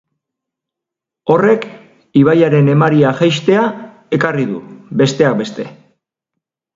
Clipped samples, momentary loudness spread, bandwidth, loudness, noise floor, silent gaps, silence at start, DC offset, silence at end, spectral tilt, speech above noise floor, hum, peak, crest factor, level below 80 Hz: under 0.1%; 15 LU; 7.8 kHz; -13 LUFS; -83 dBFS; none; 1.25 s; under 0.1%; 1.05 s; -7 dB/octave; 71 dB; none; 0 dBFS; 14 dB; -56 dBFS